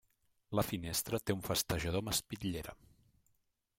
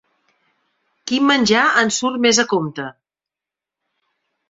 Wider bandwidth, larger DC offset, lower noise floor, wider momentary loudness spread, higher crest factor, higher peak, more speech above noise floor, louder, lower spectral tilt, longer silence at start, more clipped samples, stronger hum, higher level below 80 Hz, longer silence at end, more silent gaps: first, 16.5 kHz vs 8 kHz; neither; second, -79 dBFS vs -88 dBFS; second, 6 LU vs 16 LU; about the same, 20 dB vs 18 dB; second, -18 dBFS vs -2 dBFS; second, 41 dB vs 71 dB; second, -37 LUFS vs -16 LUFS; first, -4 dB/octave vs -2.5 dB/octave; second, 0.5 s vs 1.05 s; neither; neither; first, -56 dBFS vs -62 dBFS; second, 1.05 s vs 1.6 s; neither